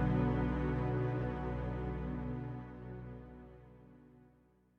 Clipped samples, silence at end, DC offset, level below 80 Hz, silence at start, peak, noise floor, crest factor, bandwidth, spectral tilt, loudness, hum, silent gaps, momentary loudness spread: under 0.1%; 0.55 s; under 0.1%; -46 dBFS; 0 s; -22 dBFS; -68 dBFS; 16 dB; 5.2 kHz; -10 dB/octave; -38 LUFS; 60 Hz at -70 dBFS; none; 21 LU